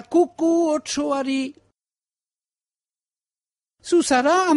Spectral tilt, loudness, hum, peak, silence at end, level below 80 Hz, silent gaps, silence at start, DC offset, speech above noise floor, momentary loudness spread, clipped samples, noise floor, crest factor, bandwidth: -2.5 dB/octave; -21 LUFS; none; -6 dBFS; 0 s; -62 dBFS; none; 0.1 s; under 0.1%; over 71 dB; 9 LU; under 0.1%; under -90 dBFS; 16 dB; 11.5 kHz